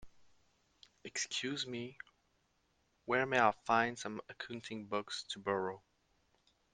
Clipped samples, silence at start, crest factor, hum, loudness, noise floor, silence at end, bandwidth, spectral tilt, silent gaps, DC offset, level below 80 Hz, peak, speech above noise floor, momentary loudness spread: under 0.1%; 0 s; 26 dB; none; -37 LUFS; -77 dBFS; 0.95 s; 10 kHz; -3 dB/octave; none; under 0.1%; -76 dBFS; -14 dBFS; 40 dB; 20 LU